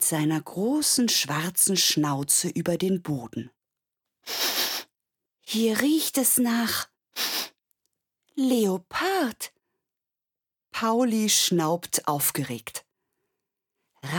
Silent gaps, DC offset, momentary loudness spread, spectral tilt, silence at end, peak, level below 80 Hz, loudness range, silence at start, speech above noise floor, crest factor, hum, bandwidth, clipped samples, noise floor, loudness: none; under 0.1%; 15 LU; -3 dB/octave; 0 s; -4 dBFS; -68 dBFS; 5 LU; 0 s; 65 dB; 22 dB; none; 19 kHz; under 0.1%; -89 dBFS; -24 LUFS